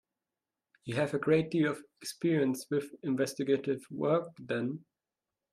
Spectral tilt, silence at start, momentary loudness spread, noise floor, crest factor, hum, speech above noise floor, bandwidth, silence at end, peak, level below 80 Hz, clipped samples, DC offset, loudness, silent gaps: -6 dB/octave; 0.85 s; 10 LU; under -90 dBFS; 18 dB; none; over 58 dB; 14 kHz; 0.75 s; -14 dBFS; -74 dBFS; under 0.1%; under 0.1%; -32 LUFS; none